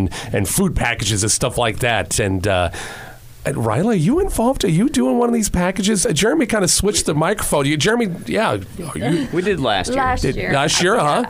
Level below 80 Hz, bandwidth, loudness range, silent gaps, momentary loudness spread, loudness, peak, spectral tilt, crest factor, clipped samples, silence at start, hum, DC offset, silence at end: -34 dBFS; 16 kHz; 2 LU; none; 6 LU; -17 LUFS; -2 dBFS; -4 dB/octave; 14 dB; under 0.1%; 0 s; none; under 0.1%; 0 s